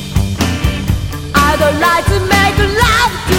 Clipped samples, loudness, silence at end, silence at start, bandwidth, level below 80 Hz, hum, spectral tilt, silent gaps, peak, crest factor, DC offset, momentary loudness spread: under 0.1%; -12 LUFS; 0 s; 0 s; 17.5 kHz; -22 dBFS; none; -4.5 dB/octave; none; 0 dBFS; 12 dB; under 0.1%; 7 LU